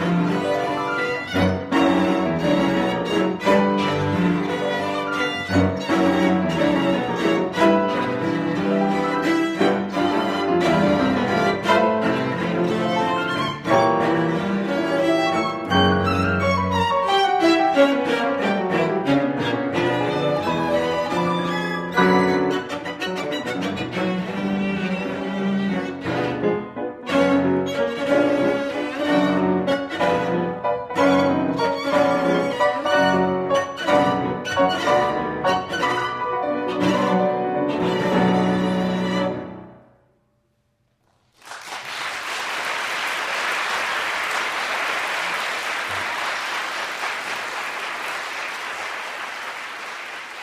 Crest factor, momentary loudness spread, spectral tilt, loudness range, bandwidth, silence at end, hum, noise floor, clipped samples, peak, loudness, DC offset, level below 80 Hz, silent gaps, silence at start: 18 dB; 8 LU; -5.5 dB/octave; 6 LU; 15.5 kHz; 0 s; none; -67 dBFS; under 0.1%; -2 dBFS; -21 LUFS; under 0.1%; -54 dBFS; none; 0 s